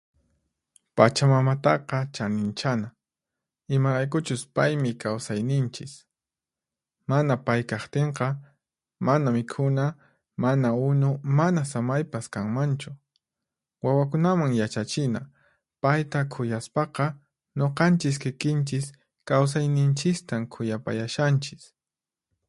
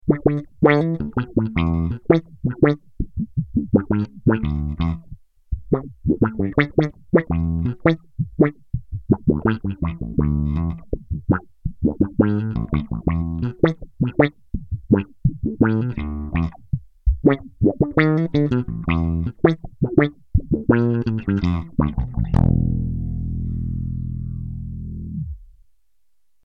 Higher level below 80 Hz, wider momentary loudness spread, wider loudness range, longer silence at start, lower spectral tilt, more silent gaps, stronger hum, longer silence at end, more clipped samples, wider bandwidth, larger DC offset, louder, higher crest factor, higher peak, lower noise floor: second, -64 dBFS vs -32 dBFS; about the same, 9 LU vs 11 LU; about the same, 3 LU vs 3 LU; first, 0.95 s vs 0.05 s; second, -6.5 dB/octave vs -10 dB/octave; neither; neither; second, 0.85 s vs 1 s; neither; first, 11.5 kHz vs 5.8 kHz; second, under 0.1% vs 0.2%; second, -25 LUFS vs -22 LUFS; about the same, 24 dB vs 20 dB; about the same, 0 dBFS vs 0 dBFS; first, under -90 dBFS vs -76 dBFS